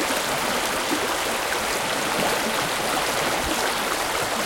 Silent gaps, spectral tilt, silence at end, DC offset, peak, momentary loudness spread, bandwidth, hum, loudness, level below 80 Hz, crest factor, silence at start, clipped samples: none; -1.5 dB/octave; 0 s; under 0.1%; -8 dBFS; 1 LU; 17 kHz; none; -23 LUFS; -48 dBFS; 16 dB; 0 s; under 0.1%